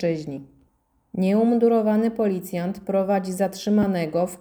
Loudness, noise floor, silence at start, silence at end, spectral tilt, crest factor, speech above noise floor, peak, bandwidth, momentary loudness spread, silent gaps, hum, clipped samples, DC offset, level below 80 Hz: -22 LUFS; -65 dBFS; 0 s; 0.05 s; -7 dB/octave; 14 dB; 43 dB; -8 dBFS; over 20 kHz; 10 LU; none; none; under 0.1%; under 0.1%; -60 dBFS